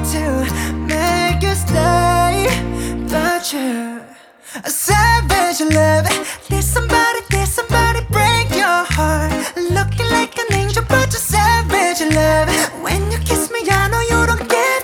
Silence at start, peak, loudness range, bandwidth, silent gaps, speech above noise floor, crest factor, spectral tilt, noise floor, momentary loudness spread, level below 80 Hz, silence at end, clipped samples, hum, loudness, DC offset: 0 s; 0 dBFS; 2 LU; over 20 kHz; none; 25 dB; 16 dB; -4 dB/octave; -40 dBFS; 7 LU; -26 dBFS; 0 s; under 0.1%; none; -15 LUFS; under 0.1%